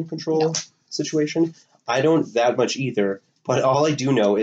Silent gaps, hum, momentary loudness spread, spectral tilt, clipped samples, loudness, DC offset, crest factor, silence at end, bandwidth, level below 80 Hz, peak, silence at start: none; none; 9 LU; -5 dB/octave; under 0.1%; -22 LUFS; under 0.1%; 14 dB; 0 s; 8.2 kHz; -70 dBFS; -6 dBFS; 0 s